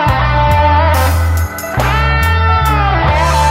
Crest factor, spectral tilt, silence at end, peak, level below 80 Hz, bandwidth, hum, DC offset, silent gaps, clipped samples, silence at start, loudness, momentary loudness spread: 10 dB; -5.5 dB/octave; 0 s; 0 dBFS; -16 dBFS; 16.5 kHz; none; under 0.1%; none; under 0.1%; 0 s; -12 LUFS; 5 LU